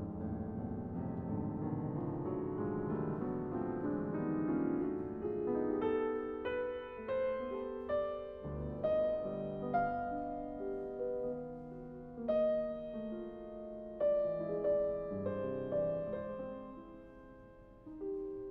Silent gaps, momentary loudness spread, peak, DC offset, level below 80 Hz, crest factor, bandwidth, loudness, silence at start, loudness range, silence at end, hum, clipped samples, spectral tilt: none; 13 LU; -22 dBFS; under 0.1%; -60 dBFS; 16 dB; 4.7 kHz; -38 LUFS; 0 s; 3 LU; 0 s; none; under 0.1%; -8 dB/octave